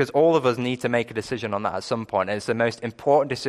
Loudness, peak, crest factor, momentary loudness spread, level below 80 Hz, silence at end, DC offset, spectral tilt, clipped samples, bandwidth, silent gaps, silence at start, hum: -24 LUFS; -8 dBFS; 16 dB; 9 LU; -60 dBFS; 0 s; under 0.1%; -5.5 dB/octave; under 0.1%; 13 kHz; none; 0 s; none